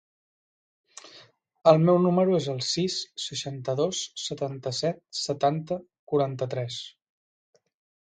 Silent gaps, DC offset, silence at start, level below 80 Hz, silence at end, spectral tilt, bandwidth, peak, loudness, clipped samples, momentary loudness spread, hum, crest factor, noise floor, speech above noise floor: 5.99-6.07 s; under 0.1%; 1.05 s; -68 dBFS; 1.15 s; -5.5 dB/octave; 9.4 kHz; -4 dBFS; -26 LUFS; under 0.1%; 14 LU; none; 22 dB; -55 dBFS; 29 dB